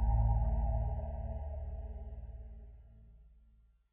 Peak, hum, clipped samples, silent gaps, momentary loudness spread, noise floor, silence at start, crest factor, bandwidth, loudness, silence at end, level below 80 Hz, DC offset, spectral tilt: -22 dBFS; none; under 0.1%; none; 21 LU; -65 dBFS; 0 s; 14 dB; 2.2 kHz; -38 LUFS; 0.65 s; -38 dBFS; under 0.1%; -11.5 dB/octave